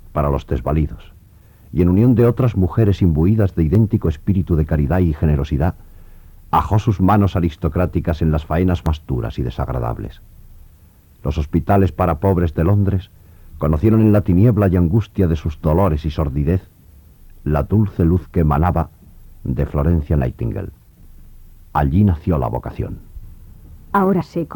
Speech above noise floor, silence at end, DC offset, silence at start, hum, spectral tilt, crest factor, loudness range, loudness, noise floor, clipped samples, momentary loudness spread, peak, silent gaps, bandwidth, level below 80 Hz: 31 dB; 0 s; under 0.1%; 0.05 s; none; -10 dB/octave; 14 dB; 6 LU; -18 LUFS; -47 dBFS; under 0.1%; 11 LU; -2 dBFS; none; 19 kHz; -28 dBFS